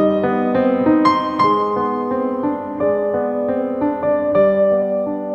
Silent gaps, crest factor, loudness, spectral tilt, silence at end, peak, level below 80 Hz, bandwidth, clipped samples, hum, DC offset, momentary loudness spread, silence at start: none; 14 dB; -17 LUFS; -8 dB/octave; 0 s; -2 dBFS; -56 dBFS; 8.2 kHz; under 0.1%; none; under 0.1%; 6 LU; 0 s